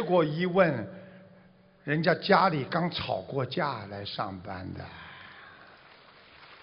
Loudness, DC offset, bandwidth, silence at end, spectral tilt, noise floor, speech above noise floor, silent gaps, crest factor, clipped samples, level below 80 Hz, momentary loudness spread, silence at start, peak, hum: -28 LUFS; under 0.1%; 5.6 kHz; 0.1 s; -9 dB/octave; -58 dBFS; 30 dB; none; 22 dB; under 0.1%; -66 dBFS; 23 LU; 0 s; -8 dBFS; none